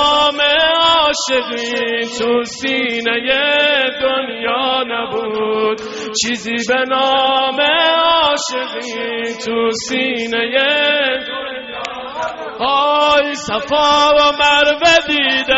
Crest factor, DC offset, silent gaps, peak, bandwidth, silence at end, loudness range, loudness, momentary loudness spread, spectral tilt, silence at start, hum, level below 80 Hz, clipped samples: 14 dB; under 0.1%; none; -2 dBFS; 8 kHz; 0 s; 4 LU; -14 LUFS; 10 LU; 1 dB/octave; 0 s; none; -48 dBFS; under 0.1%